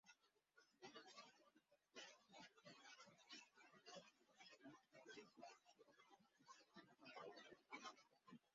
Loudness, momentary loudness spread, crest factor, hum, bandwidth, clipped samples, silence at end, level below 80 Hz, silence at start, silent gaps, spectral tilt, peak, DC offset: -64 LUFS; 7 LU; 22 dB; none; 7.4 kHz; under 0.1%; 0 s; under -90 dBFS; 0.05 s; none; -1 dB/octave; -44 dBFS; under 0.1%